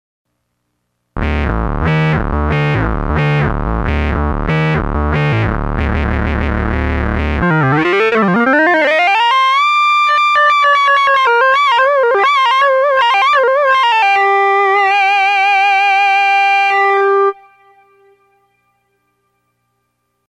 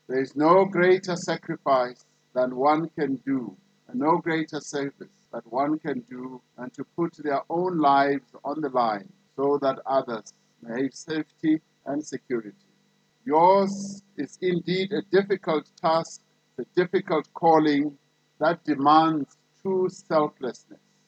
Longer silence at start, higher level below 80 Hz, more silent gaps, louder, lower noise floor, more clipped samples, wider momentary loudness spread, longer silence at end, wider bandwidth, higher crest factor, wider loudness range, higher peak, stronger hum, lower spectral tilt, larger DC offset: first, 1.15 s vs 0.1 s; first, -24 dBFS vs -82 dBFS; neither; first, -12 LUFS vs -25 LUFS; about the same, -68 dBFS vs -66 dBFS; neither; second, 7 LU vs 17 LU; first, 3.05 s vs 0.35 s; first, 10.5 kHz vs 8.8 kHz; second, 10 dB vs 20 dB; about the same, 6 LU vs 6 LU; first, -2 dBFS vs -6 dBFS; first, 60 Hz at -45 dBFS vs none; about the same, -6 dB/octave vs -6 dB/octave; neither